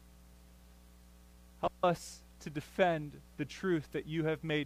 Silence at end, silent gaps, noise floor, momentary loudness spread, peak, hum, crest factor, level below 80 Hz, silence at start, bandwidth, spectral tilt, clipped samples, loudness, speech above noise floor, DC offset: 0 s; none; -58 dBFS; 13 LU; -16 dBFS; 60 Hz at -60 dBFS; 20 dB; -60 dBFS; 0.3 s; 15.5 kHz; -6 dB/octave; under 0.1%; -36 LUFS; 23 dB; under 0.1%